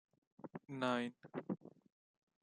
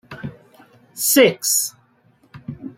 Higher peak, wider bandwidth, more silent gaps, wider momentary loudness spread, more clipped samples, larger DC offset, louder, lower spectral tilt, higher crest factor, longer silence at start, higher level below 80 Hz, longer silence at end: second, -24 dBFS vs -2 dBFS; second, 9.8 kHz vs 16.5 kHz; neither; second, 17 LU vs 23 LU; neither; neither; second, -43 LUFS vs -16 LUFS; first, -6 dB/octave vs -2.5 dB/octave; about the same, 22 dB vs 20 dB; first, 0.45 s vs 0.1 s; second, -86 dBFS vs -60 dBFS; first, 0.75 s vs 0.05 s